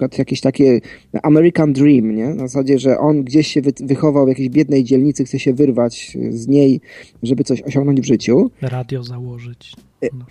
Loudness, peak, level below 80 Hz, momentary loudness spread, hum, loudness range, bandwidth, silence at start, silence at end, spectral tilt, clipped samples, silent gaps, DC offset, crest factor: -15 LUFS; -2 dBFS; -52 dBFS; 13 LU; none; 3 LU; 11 kHz; 0 s; 0.05 s; -7 dB/octave; under 0.1%; none; under 0.1%; 14 dB